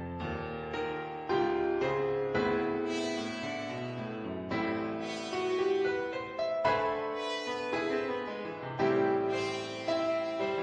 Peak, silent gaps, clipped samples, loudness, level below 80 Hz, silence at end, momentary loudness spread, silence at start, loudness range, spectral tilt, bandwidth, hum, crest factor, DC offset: -16 dBFS; none; under 0.1%; -33 LUFS; -60 dBFS; 0 s; 8 LU; 0 s; 2 LU; -5.5 dB/octave; 10 kHz; none; 16 dB; under 0.1%